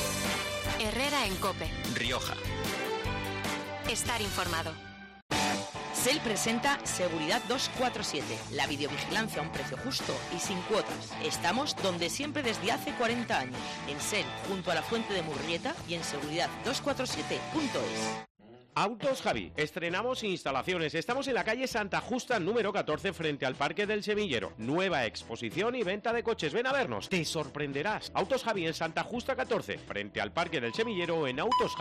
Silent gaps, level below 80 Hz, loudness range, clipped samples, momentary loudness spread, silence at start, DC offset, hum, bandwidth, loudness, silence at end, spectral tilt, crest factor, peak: 5.22-5.29 s, 18.30-18.35 s; -54 dBFS; 2 LU; under 0.1%; 6 LU; 0 s; under 0.1%; none; 14 kHz; -32 LUFS; 0 s; -3.5 dB/octave; 14 dB; -18 dBFS